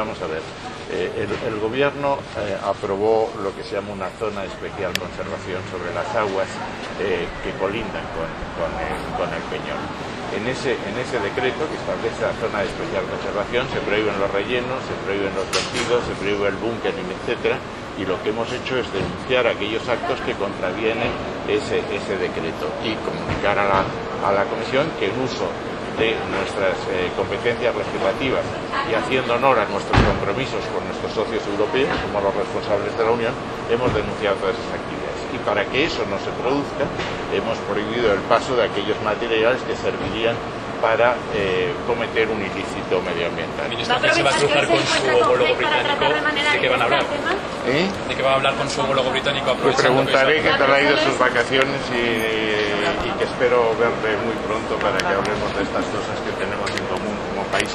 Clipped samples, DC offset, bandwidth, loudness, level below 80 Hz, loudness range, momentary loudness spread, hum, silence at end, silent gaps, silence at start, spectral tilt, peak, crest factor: under 0.1%; under 0.1%; 12.5 kHz; -21 LUFS; -42 dBFS; 7 LU; 9 LU; none; 0 s; none; 0 s; -4.5 dB/octave; 0 dBFS; 22 dB